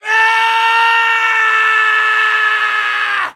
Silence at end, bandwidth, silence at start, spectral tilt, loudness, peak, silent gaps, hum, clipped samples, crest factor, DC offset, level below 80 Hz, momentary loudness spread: 0.05 s; 15 kHz; 0.05 s; 2 dB/octave; -11 LUFS; 0 dBFS; none; none; under 0.1%; 12 dB; under 0.1%; -80 dBFS; 4 LU